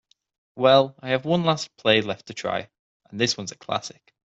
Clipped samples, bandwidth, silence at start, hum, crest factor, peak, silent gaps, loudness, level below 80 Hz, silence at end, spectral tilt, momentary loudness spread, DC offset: under 0.1%; 8 kHz; 0.55 s; none; 20 dB; -4 dBFS; 2.79-3.00 s; -23 LUFS; -66 dBFS; 0.45 s; -4.5 dB/octave; 13 LU; under 0.1%